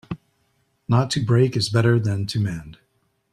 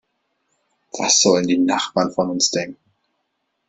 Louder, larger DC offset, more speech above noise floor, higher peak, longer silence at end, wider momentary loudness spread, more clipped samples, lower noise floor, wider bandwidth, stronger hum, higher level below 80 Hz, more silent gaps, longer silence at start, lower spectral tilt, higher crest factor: second, -21 LUFS vs -17 LUFS; neither; second, 48 dB vs 55 dB; second, -4 dBFS vs 0 dBFS; second, 0.6 s vs 0.95 s; first, 17 LU vs 12 LU; neither; second, -68 dBFS vs -73 dBFS; first, 11 kHz vs 8.4 kHz; neither; first, -52 dBFS vs -62 dBFS; neither; second, 0.1 s vs 0.95 s; first, -6 dB/octave vs -2.5 dB/octave; about the same, 18 dB vs 20 dB